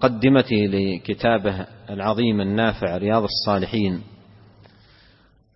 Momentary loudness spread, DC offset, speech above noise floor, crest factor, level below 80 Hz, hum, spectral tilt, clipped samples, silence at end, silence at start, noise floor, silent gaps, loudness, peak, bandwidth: 9 LU; under 0.1%; 35 dB; 18 dB; -48 dBFS; none; -9.5 dB/octave; under 0.1%; 1.4 s; 0 s; -56 dBFS; none; -21 LUFS; -4 dBFS; 6 kHz